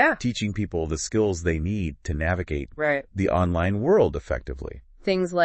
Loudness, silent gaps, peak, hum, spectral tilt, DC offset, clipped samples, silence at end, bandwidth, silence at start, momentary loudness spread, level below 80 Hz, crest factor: -25 LUFS; none; -6 dBFS; none; -6 dB/octave; under 0.1%; under 0.1%; 0 s; 8.6 kHz; 0 s; 10 LU; -40 dBFS; 18 dB